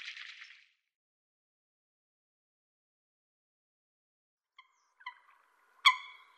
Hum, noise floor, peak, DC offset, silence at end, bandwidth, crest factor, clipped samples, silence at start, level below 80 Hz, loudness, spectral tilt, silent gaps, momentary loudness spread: none; -68 dBFS; -10 dBFS; under 0.1%; 0.3 s; 13 kHz; 32 dB; under 0.1%; 0 s; under -90 dBFS; -29 LUFS; 7.5 dB/octave; 0.96-4.37 s; 24 LU